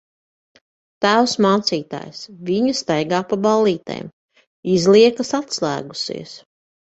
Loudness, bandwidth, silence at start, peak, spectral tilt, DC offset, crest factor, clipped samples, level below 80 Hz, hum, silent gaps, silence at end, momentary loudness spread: -18 LUFS; 8.2 kHz; 1 s; -2 dBFS; -4.5 dB/octave; under 0.1%; 18 dB; under 0.1%; -60 dBFS; none; 4.13-4.29 s, 4.47-4.63 s; 0.55 s; 18 LU